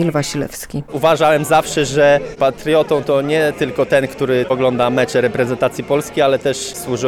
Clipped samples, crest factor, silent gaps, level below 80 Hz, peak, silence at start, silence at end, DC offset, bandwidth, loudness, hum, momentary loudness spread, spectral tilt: under 0.1%; 12 dB; none; -46 dBFS; -4 dBFS; 0 s; 0 s; under 0.1%; 18 kHz; -16 LUFS; none; 8 LU; -5 dB/octave